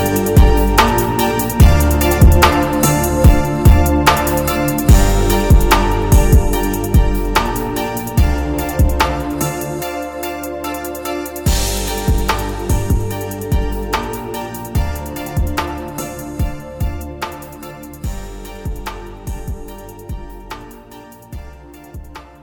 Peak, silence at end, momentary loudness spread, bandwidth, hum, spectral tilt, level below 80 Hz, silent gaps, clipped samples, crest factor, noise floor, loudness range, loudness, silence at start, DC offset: 0 dBFS; 0.15 s; 19 LU; over 20 kHz; none; -5.5 dB/octave; -18 dBFS; none; under 0.1%; 14 dB; -38 dBFS; 17 LU; -16 LUFS; 0 s; under 0.1%